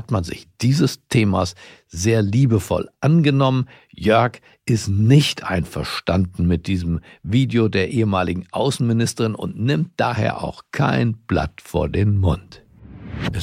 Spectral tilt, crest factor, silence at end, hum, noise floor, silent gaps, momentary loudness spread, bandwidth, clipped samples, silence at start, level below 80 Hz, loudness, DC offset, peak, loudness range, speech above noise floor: -6.5 dB/octave; 16 dB; 0 s; none; -38 dBFS; none; 10 LU; 15.5 kHz; under 0.1%; 0 s; -40 dBFS; -20 LUFS; under 0.1%; -2 dBFS; 3 LU; 19 dB